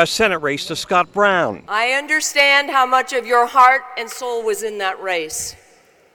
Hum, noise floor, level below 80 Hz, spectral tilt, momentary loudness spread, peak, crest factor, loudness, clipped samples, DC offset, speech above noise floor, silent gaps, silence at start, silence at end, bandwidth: none; -52 dBFS; -56 dBFS; -2 dB/octave; 12 LU; 0 dBFS; 16 dB; -16 LUFS; under 0.1%; under 0.1%; 35 dB; none; 0 s; 0.6 s; 18 kHz